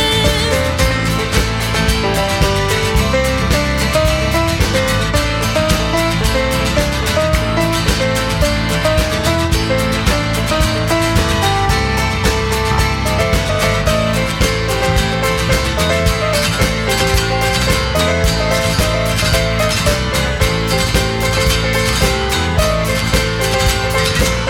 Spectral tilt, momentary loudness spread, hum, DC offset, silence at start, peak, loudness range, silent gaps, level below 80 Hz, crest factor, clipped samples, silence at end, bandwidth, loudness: -4 dB/octave; 2 LU; none; under 0.1%; 0 s; 0 dBFS; 1 LU; none; -22 dBFS; 14 dB; under 0.1%; 0 s; 17.5 kHz; -14 LUFS